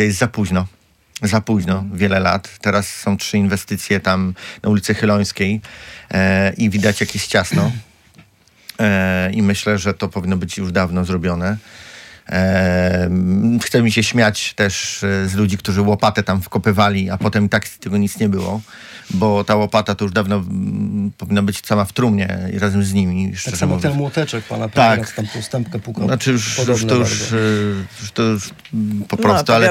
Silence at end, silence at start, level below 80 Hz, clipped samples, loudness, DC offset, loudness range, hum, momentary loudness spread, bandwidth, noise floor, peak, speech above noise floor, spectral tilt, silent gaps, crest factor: 0 s; 0 s; -50 dBFS; under 0.1%; -17 LUFS; under 0.1%; 2 LU; none; 8 LU; 16.5 kHz; -49 dBFS; -2 dBFS; 33 dB; -5.5 dB/octave; none; 16 dB